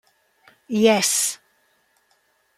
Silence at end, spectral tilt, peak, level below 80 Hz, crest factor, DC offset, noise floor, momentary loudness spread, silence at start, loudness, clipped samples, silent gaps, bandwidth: 1.25 s; -2.5 dB/octave; -2 dBFS; -70 dBFS; 22 dB; under 0.1%; -65 dBFS; 12 LU; 0.7 s; -19 LUFS; under 0.1%; none; 15.5 kHz